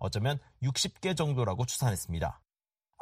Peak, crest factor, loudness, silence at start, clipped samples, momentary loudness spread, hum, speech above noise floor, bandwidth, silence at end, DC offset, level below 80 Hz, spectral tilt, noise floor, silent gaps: -16 dBFS; 18 dB; -32 LUFS; 0 s; under 0.1%; 5 LU; none; 57 dB; 15.5 kHz; 0.65 s; under 0.1%; -50 dBFS; -4.5 dB/octave; -88 dBFS; none